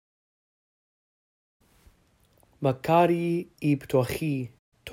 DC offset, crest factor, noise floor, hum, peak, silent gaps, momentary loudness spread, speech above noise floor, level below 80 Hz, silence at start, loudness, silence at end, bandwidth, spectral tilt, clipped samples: under 0.1%; 22 dB; -64 dBFS; none; -8 dBFS; 4.59-4.72 s; 11 LU; 39 dB; -60 dBFS; 2.6 s; -26 LUFS; 0 s; 16 kHz; -7 dB/octave; under 0.1%